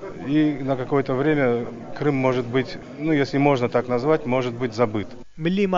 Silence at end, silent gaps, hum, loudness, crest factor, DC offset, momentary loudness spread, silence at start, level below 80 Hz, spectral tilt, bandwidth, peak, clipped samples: 0 s; none; none; -22 LUFS; 18 dB; under 0.1%; 8 LU; 0 s; -50 dBFS; -6 dB/octave; 7.6 kHz; -4 dBFS; under 0.1%